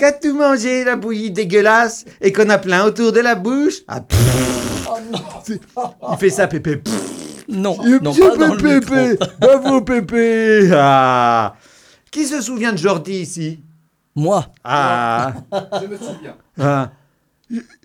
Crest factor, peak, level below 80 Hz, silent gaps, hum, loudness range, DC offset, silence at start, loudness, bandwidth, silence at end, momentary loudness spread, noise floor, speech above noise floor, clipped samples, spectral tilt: 14 dB; 0 dBFS; -40 dBFS; none; none; 8 LU; under 0.1%; 0 s; -15 LUFS; 19 kHz; 0.2 s; 16 LU; -59 dBFS; 44 dB; under 0.1%; -5.5 dB/octave